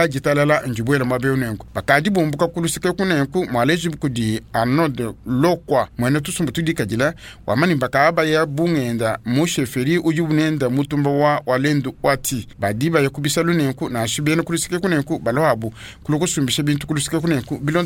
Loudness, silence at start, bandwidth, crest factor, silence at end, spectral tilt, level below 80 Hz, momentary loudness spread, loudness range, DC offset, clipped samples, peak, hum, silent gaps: -19 LUFS; 0 s; 17.5 kHz; 18 dB; 0 s; -5 dB/octave; -46 dBFS; 5 LU; 2 LU; under 0.1%; under 0.1%; -2 dBFS; none; none